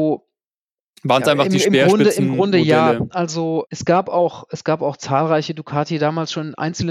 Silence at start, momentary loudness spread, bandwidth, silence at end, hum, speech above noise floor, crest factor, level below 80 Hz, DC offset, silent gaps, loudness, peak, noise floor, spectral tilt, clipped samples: 0 s; 10 LU; 15 kHz; 0 s; none; over 73 dB; 16 dB; -56 dBFS; under 0.1%; 0.54-0.94 s; -18 LUFS; -2 dBFS; under -90 dBFS; -5.5 dB/octave; under 0.1%